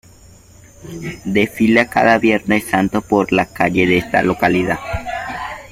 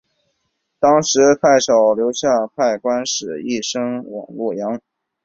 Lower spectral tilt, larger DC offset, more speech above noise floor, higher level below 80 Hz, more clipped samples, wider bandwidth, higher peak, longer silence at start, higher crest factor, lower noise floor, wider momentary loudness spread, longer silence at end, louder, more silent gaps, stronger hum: first, -6 dB/octave vs -3.5 dB/octave; neither; second, 28 dB vs 55 dB; first, -42 dBFS vs -58 dBFS; neither; first, 16 kHz vs 8 kHz; about the same, 0 dBFS vs 0 dBFS; about the same, 0.8 s vs 0.8 s; about the same, 16 dB vs 16 dB; second, -44 dBFS vs -71 dBFS; about the same, 13 LU vs 12 LU; second, 0 s vs 0.45 s; about the same, -16 LUFS vs -17 LUFS; neither; neither